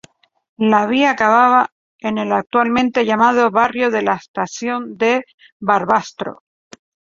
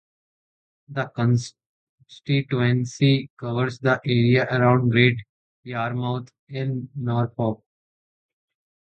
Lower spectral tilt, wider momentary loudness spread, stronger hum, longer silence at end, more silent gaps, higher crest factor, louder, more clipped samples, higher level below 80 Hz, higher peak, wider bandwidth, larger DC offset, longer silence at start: second, -5 dB/octave vs -7 dB/octave; second, 11 LU vs 14 LU; neither; second, 0.85 s vs 1.3 s; second, 1.72-1.99 s, 4.28-4.34 s, 5.34-5.38 s, 5.52-5.60 s vs 1.66-1.98 s, 3.30-3.37 s, 5.29-5.63 s, 6.39-6.47 s; about the same, 16 dB vs 20 dB; first, -16 LUFS vs -23 LUFS; neither; about the same, -58 dBFS vs -58 dBFS; about the same, -2 dBFS vs -4 dBFS; second, 7.6 kHz vs 8.6 kHz; neither; second, 0.6 s vs 0.9 s